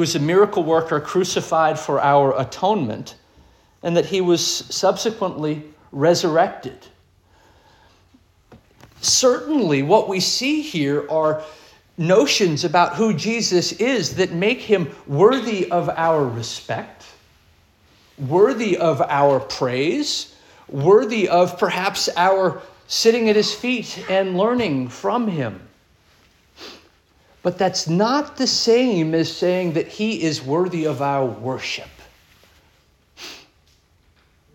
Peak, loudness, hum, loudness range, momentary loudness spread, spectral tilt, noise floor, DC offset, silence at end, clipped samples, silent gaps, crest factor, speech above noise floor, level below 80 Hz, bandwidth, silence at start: -2 dBFS; -19 LUFS; none; 6 LU; 12 LU; -4 dB/octave; -58 dBFS; under 0.1%; 1.15 s; under 0.1%; none; 18 dB; 39 dB; -60 dBFS; 17 kHz; 0 s